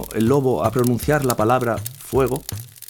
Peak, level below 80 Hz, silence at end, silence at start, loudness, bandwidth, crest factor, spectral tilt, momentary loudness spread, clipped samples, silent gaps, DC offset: -4 dBFS; -42 dBFS; 0.05 s; 0 s; -20 LUFS; 19 kHz; 16 dB; -6 dB/octave; 8 LU; under 0.1%; none; under 0.1%